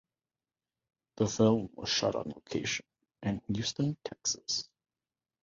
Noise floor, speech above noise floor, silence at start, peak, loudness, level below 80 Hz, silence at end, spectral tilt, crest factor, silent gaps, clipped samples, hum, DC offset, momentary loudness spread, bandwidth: under -90 dBFS; over 58 dB; 1.15 s; -14 dBFS; -32 LUFS; -62 dBFS; 0.8 s; -4 dB/octave; 22 dB; none; under 0.1%; none; under 0.1%; 10 LU; 7.8 kHz